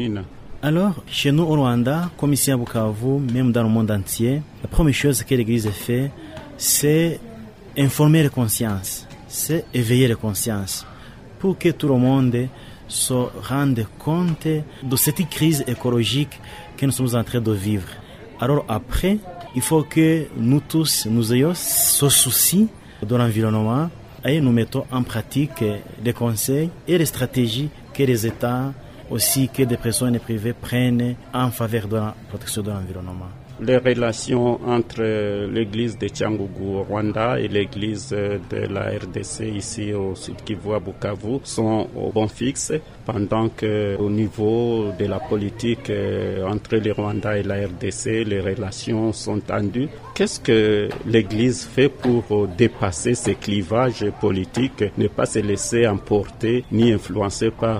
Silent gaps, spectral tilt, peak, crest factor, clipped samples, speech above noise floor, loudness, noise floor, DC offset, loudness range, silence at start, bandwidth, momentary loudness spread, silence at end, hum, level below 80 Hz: none; -5 dB/octave; -2 dBFS; 18 dB; under 0.1%; 19 dB; -21 LUFS; -40 dBFS; under 0.1%; 6 LU; 0 s; 16 kHz; 9 LU; 0 s; none; -40 dBFS